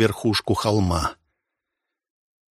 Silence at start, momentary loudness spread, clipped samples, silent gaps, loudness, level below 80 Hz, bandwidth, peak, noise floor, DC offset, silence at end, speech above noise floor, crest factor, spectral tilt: 0 s; 5 LU; under 0.1%; none; -22 LUFS; -42 dBFS; 13 kHz; -4 dBFS; -84 dBFS; under 0.1%; 1.4 s; 62 dB; 20 dB; -5.5 dB/octave